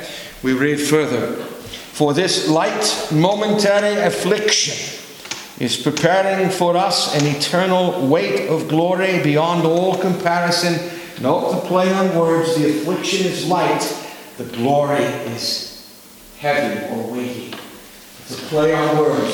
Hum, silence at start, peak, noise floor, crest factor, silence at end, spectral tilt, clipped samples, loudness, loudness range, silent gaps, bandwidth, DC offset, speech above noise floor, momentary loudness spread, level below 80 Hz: none; 0 s; 0 dBFS; -42 dBFS; 18 dB; 0 s; -4.5 dB/octave; under 0.1%; -17 LUFS; 5 LU; none; 19.5 kHz; under 0.1%; 24 dB; 14 LU; -56 dBFS